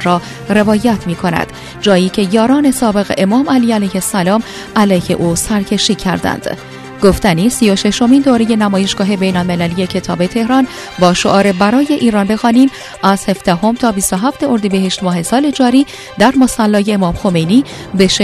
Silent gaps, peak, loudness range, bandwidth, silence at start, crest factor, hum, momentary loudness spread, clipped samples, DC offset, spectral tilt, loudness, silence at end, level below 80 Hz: none; 0 dBFS; 2 LU; 14 kHz; 0 s; 12 dB; none; 6 LU; 0.2%; under 0.1%; -5 dB/octave; -12 LUFS; 0 s; -36 dBFS